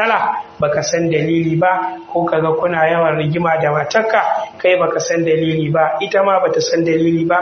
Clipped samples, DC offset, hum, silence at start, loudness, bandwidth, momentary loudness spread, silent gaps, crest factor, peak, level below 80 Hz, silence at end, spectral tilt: under 0.1%; under 0.1%; none; 0 s; -15 LUFS; 6.8 kHz; 3 LU; none; 14 dB; 0 dBFS; -54 dBFS; 0 s; -4.5 dB/octave